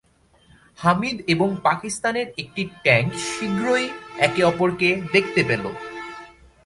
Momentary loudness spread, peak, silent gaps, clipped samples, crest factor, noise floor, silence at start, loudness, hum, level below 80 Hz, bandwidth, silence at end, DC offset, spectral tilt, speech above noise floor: 12 LU; -2 dBFS; none; under 0.1%; 20 dB; -57 dBFS; 0.8 s; -21 LUFS; none; -54 dBFS; 11.5 kHz; 0.35 s; under 0.1%; -5 dB/octave; 35 dB